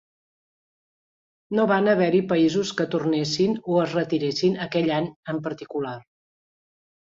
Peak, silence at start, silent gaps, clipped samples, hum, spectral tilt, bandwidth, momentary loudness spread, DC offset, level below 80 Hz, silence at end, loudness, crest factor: -8 dBFS; 1.5 s; 5.16-5.23 s; under 0.1%; none; -6 dB/octave; 7.8 kHz; 11 LU; under 0.1%; -66 dBFS; 1.1 s; -23 LUFS; 18 dB